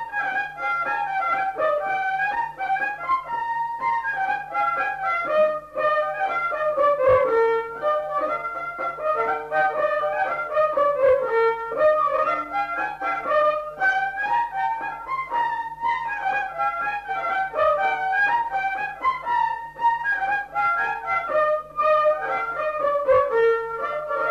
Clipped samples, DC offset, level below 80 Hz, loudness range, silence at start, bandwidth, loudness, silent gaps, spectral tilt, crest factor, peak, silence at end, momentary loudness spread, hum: under 0.1%; under 0.1%; -56 dBFS; 3 LU; 0 s; 13 kHz; -23 LUFS; none; -4.5 dB/octave; 14 dB; -8 dBFS; 0 s; 7 LU; none